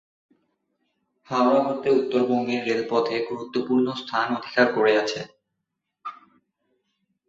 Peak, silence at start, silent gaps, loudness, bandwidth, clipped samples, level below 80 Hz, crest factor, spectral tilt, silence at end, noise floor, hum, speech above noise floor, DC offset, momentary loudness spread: -6 dBFS; 1.3 s; none; -23 LUFS; 7.8 kHz; under 0.1%; -70 dBFS; 20 dB; -5 dB/octave; 1.15 s; -81 dBFS; none; 59 dB; under 0.1%; 16 LU